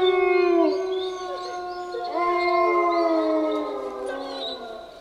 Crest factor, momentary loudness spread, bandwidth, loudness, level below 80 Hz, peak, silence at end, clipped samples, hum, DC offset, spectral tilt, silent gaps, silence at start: 14 dB; 12 LU; 10 kHz; -24 LUFS; -60 dBFS; -8 dBFS; 0 s; under 0.1%; none; under 0.1%; -4 dB/octave; none; 0 s